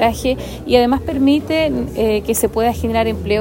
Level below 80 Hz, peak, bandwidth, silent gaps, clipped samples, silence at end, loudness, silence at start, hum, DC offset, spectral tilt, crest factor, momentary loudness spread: -32 dBFS; 0 dBFS; 16.5 kHz; none; under 0.1%; 0 s; -17 LUFS; 0 s; none; under 0.1%; -5 dB/octave; 16 dB; 5 LU